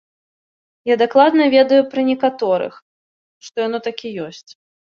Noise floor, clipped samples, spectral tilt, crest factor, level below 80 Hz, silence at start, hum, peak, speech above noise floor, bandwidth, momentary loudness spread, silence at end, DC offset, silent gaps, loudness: under -90 dBFS; under 0.1%; -5.5 dB/octave; 16 dB; -66 dBFS; 0.85 s; none; -2 dBFS; over 74 dB; 7 kHz; 16 LU; 0.55 s; under 0.1%; 2.82-3.41 s; -16 LUFS